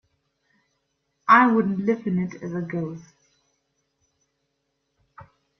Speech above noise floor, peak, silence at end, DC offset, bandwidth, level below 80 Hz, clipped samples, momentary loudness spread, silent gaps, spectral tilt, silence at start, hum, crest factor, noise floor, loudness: 54 dB; -2 dBFS; 0.35 s; under 0.1%; 6.4 kHz; -68 dBFS; under 0.1%; 17 LU; none; -8 dB/octave; 1.25 s; none; 24 dB; -76 dBFS; -21 LUFS